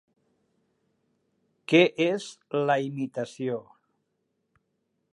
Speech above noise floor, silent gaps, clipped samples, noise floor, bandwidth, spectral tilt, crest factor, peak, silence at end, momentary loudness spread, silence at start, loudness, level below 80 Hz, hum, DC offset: 52 dB; none; under 0.1%; -77 dBFS; 11 kHz; -5.5 dB/octave; 24 dB; -6 dBFS; 1.55 s; 12 LU; 1.7 s; -26 LUFS; -82 dBFS; none; under 0.1%